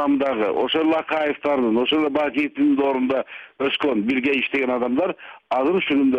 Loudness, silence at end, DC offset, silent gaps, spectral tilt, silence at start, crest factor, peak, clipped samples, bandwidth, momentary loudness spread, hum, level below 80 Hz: -21 LUFS; 0 s; under 0.1%; none; -6.5 dB/octave; 0 s; 12 dB; -10 dBFS; under 0.1%; 5.6 kHz; 5 LU; none; -60 dBFS